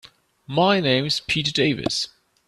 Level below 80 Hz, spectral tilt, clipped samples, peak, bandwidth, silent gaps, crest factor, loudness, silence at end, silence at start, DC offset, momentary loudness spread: -54 dBFS; -4.5 dB/octave; under 0.1%; -4 dBFS; 13.5 kHz; none; 18 dB; -21 LUFS; 0.4 s; 0.5 s; under 0.1%; 8 LU